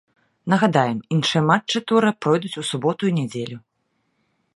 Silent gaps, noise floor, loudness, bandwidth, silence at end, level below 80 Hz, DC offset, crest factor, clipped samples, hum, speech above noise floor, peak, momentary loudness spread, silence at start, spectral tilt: none; -71 dBFS; -20 LUFS; 11.5 kHz; 1 s; -64 dBFS; under 0.1%; 20 dB; under 0.1%; none; 51 dB; 0 dBFS; 12 LU; 0.45 s; -5.5 dB/octave